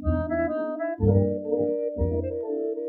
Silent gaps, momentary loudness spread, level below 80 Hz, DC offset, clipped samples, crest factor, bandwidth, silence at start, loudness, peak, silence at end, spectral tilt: none; 7 LU; -38 dBFS; under 0.1%; under 0.1%; 18 dB; 3.1 kHz; 0 s; -26 LUFS; -8 dBFS; 0 s; -13 dB/octave